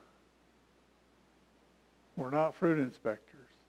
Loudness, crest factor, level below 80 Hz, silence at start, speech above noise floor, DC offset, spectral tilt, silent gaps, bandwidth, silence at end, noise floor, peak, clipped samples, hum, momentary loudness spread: -34 LUFS; 20 dB; -76 dBFS; 2.15 s; 34 dB; under 0.1%; -8.5 dB/octave; none; 11 kHz; 0.5 s; -67 dBFS; -18 dBFS; under 0.1%; none; 14 LU